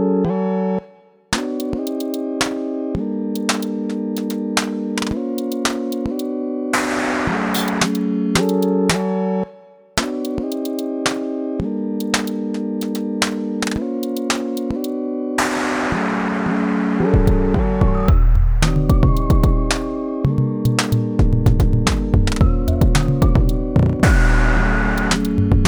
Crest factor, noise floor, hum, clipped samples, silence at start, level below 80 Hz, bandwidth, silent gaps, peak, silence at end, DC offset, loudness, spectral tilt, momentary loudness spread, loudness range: 16 dB; -47 dBFS; none; under 0.1%; 0 s; -22 dBFS; over 20 kHz; none; 0 dBFS; 0 s; under 0.1%; -19 LUFS; -5.5 dB/octave; 7 LU; 6 LU